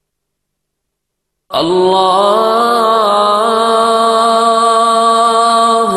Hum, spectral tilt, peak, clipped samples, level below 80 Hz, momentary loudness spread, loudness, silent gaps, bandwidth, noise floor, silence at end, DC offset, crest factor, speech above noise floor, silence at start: none; -3.5 dB/octave; 0 dBFS; under 0.1%; -58 dBFS; 2 LU; -10 LUFS; none; 13.5 kHz; -74 dBFS; 0 s; under 0.1%; 10 dB; 64 dB; 1.5 s